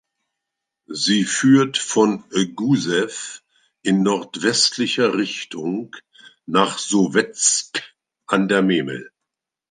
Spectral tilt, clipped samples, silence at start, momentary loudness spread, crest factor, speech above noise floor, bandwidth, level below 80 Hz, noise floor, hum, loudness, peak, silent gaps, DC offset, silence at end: -3.5 dB/octave; under 0.1%; 0.9 s; 13 LU; 18 dB; 64 dB; 9.8 kHz; -68 dBFS; -83 dBFS; none; -19 LUFS; -2 dBFS; none; under 0.1%; 0.65 s